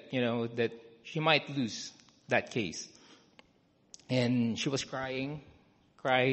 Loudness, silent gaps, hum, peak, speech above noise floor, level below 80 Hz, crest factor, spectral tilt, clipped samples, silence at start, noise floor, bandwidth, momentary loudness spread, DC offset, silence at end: -32 LUFS; none; none; -10 dBFS; 36 dB; -68 dBFS; 24 dB; -5 dB/octave; under 0.1%; 0.05 s; -68 dBFS; 8.4 kHz; 14 LU; under 0.1%; 0 s